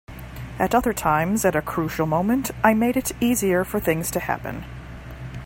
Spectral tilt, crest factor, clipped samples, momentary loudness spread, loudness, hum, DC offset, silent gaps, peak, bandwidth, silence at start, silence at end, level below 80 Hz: -5 dB/octave; 22 dB; under 0.1%; 17 LU; -22 LUFS; none; under 0.1%; none; 0 dBFS; 16.5 kHz; 0.1 s; 0 s; -42 dBFS